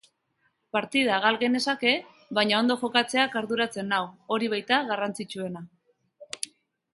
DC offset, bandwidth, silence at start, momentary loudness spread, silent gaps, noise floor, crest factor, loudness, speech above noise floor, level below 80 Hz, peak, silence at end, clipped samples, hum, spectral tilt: under 0.1%; 11.5 kHz; 0.75 s; 13 LU; none; -72 dBFS; 22 dB; -26 LUFS; 46 dB; -74 dBFS; -6 dBFS; 0.55 s; under 0.1%; none; -3.5 dB/octave